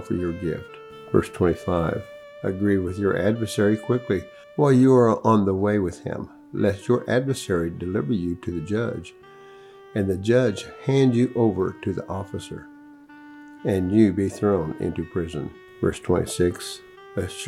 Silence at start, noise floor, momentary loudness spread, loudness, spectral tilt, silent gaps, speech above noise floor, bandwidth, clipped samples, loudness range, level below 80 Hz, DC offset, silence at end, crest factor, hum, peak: 0 s; -46 dBFS; 15 LU; -23 LUFS; -7 dB/octave; none; 24 dB; 14 kHz; under 0.1%; 5 LU; -54 dBFS; under 0.1%; 0 s; 18 dB; none; -4 dBFS